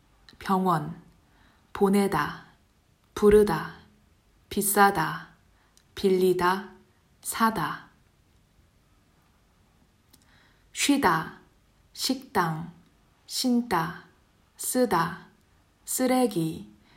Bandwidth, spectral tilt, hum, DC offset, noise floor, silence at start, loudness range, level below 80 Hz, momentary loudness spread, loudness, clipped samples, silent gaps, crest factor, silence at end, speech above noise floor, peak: 16 kHz; -4.5 dB/octave; none; under 0.1%; -64 dBFS; 0.4 s; 6 LU; -54 dBFS; 20 LU; -25 LUFS; under 0.1%; none; 20 dB; 0.3 s; 39 dB; -8 dBFS